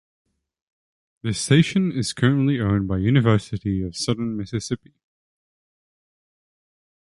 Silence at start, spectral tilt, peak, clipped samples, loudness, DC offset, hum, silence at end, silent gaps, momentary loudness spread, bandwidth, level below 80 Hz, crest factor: 1.25 s; -6 dB/octave; -4 dBFS; under 0.1%; -22 LUFS; under 0.1%; none; 2.25 s; none; 10 LU; 11.5 kHz; -46 dBFS; 20 dB